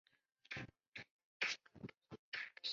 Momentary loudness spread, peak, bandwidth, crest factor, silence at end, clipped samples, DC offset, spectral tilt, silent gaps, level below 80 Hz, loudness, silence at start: 15 LU; -24 dBFS; 7.4 kHz; 26 dB; 0 s; under 0.1%; under 0.1%; -0.5 dB/octave; 0.87-0.93 s, 1.11-1.40 s, 2.19-2.32 s; -78 dBFS; -47 LUFS; 0.5 s